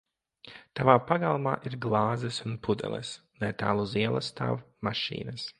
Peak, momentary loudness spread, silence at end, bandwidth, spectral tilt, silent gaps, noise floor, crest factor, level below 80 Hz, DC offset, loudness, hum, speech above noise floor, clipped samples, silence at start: -4 dBFS; 13 LU; 0.1 s; 11 kHz; -6 dB/octave; none; -54 dBFS; 26 dB; -60 dBFS; under 0.1%; -29 LUFS; none; 25 dB; under 0.1%; 0.45 s